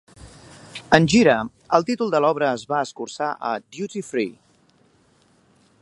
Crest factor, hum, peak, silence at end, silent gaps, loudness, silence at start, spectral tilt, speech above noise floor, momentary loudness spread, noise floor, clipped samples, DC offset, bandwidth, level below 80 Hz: 22 dB; none; 0 dBFS; 1.5 s; none; -21 LUFS; 0.2 s; -5 dB/octave; 39 dB; 14 LU; -59 dBFS; under 0.1%; under 0.1%; 11.5 kHz; -54 dBFS